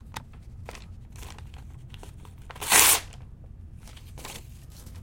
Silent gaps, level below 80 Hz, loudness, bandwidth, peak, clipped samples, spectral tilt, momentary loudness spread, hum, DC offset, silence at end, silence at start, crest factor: none; -46 dBFS; -19 LUFS; 17 kHz; 0 dBFS; under 0.1%; -0.5 dB/octave; 29 LU; none; under 0.1%; 0 s; 0.05 s; 30 dB